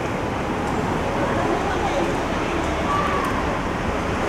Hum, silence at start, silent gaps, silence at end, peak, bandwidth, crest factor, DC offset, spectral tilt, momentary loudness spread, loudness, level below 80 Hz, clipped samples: none; 0 s; none; 0 s; -10 dBFS; 16 kHz; 14 dB; under 0.1%; -5.5 dB/octave; 3 LU; -23 LUFS; -34 dBFS; under 0.1%